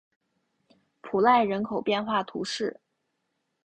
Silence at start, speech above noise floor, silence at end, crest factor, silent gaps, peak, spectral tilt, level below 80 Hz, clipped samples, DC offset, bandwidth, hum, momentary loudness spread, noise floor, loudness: 1.05 s; 53 dB; 0.95 s; 22 dB; none; -8 dBFS; -4.5 dB/octave; -68 dBFS; under 0.1%; under 0.1%; 9.6 kHz; none; 11 LU; -78 dBFS; -26 LUFS